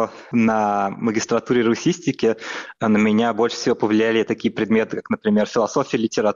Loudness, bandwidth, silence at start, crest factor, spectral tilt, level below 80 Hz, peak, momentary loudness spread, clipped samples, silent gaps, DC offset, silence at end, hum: -20 LUFS; 7.4 kHz; 0 s; 12 dB; -5.5 dB/octave; -60 dBFS; -8 dBFS; 5 LU; under 0.1%; none; under 0.1%; 0 s; none